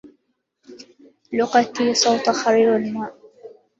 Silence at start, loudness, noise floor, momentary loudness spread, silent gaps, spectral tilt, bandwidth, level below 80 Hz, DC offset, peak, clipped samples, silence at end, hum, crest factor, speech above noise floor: 0.05 s; -19 LUFS; -69 dBFS; 11 LU; none; -3 dB/octave; 7.8 kHz; -66 dBFS; under 0.1%; -2 dBFS; under 0.1%; 0.3 s; none; 18 dB; 51 dB